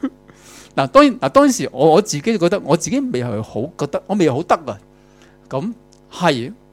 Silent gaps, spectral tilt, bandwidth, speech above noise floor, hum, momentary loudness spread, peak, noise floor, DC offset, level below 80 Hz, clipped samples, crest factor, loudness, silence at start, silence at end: none; -5 dB/octave; 15.5 kHz; 31 dB; none; 14 LU; 0 dBFS; -48 dBFS; under 0.1%; -50 dBFS; under 0.1%; 18 dB; -17 LUFS; 0.05 s; 0.2 s